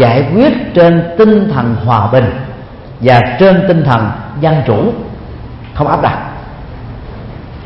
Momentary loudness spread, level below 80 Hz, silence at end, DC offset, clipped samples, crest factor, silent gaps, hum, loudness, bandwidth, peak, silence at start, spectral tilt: 20 LU; -32 dBFS; 0 s; under 0.1%; 0.2%; 10 dB; none; none; -10 LUFS; 5.8 kHz; 0 dBFS; 0 s; -9.5 dB/octave